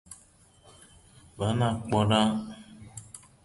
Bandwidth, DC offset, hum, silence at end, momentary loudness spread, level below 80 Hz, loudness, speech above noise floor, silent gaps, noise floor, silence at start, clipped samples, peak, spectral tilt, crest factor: 11.5 kHz; under 0.1%; none; 0.25 s; 24 LU; -54 dBFS; -27 LUFS; 33 dB; none; -59 dBFS; 0.1 s; under 0.1%; -10 dBFS; -6 dB/octave; 20 dB